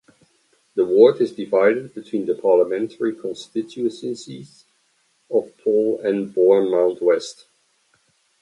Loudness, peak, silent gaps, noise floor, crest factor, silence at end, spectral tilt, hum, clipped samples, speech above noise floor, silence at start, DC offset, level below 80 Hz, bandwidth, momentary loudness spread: -20 LUFS; 0 dBFS; none; -64 dBFS; 20 dB; 1.1 s; -6 dB/octave; none; under 0.1%; 45 dB; 0.75 s; under 0.1%; -70 dBFS; 11 kHz; 15 LU